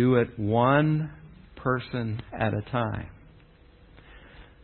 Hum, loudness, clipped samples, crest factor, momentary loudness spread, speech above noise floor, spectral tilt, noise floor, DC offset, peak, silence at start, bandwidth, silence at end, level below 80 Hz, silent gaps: none; -27 LUFS; under 0.1%; 20 dB; 13 LU; 29 dB; -11.5 dB/octave; -54 dBFS; under 0.1%; -8 dBFS; 0 s; 4.4 kHz; 0.2 s; -50 dBFS; none